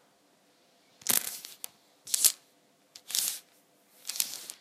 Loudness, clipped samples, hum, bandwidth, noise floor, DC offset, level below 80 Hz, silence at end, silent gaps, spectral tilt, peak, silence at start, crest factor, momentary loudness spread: -29 LUFS; under 0.1%; none; 16 kHz; -66 dBFS; under 0.1%; -86 dBFS; 0.05 s; none; 2 dB/octave; 0 dBFS; 1.05 s; 34 dB; 19 LU